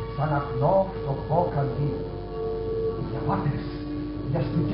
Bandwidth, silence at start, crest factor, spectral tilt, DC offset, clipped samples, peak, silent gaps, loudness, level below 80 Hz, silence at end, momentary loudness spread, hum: 5.6 kHz; 0 s; 18 dB; -8 dB/octave; under 0.1%; under 0.1%; -8 dBFS; none; -27 LUFS; -40 dBFS; 0 s; 9 LU; none